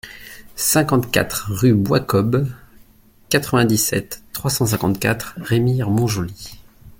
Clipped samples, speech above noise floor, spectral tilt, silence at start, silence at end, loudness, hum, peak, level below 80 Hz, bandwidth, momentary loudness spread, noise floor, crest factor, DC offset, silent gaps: under 0.1%; 32 dB; -5 dB/octave; 0.05 s; 0.1 s; -19 LUFS; none; 0 dBFS; -46 dBFS; 17 kHz; 13 LU; -50 dBFS; 18 dB; under 0.1%; none